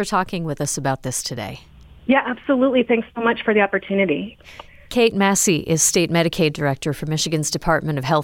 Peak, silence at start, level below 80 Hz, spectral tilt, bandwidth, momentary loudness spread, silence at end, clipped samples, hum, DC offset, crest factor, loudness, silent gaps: -4 dBFS; 0 s; -46 dBFS; -4 dB/octave; 17 kHz; 9 LU; 0 s; under 0.1%; none; under 0.1%; 16 dB; -19 LUFS; none